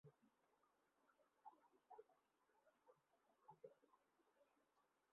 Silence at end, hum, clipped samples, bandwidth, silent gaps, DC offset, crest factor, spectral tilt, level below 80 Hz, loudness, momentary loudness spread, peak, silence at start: 0 s; none; under 0.1%; 3.3 kHz; none; under 0.1%; 24 dB; -3 dB/octave; under -90 dBFS; -69 LUFS; 2 LU; -50 dBFS; 0.05 s